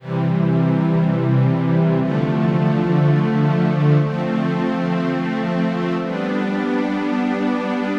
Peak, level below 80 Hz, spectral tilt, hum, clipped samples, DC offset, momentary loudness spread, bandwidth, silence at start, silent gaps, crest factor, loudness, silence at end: -6 dBFS; -54 dBFS; -9 dB/octave; none; under 0.1%; under 0.1%; 5 LU; 7 kHz; 0 s; none; 12 dB; -19 LUFS; 0 s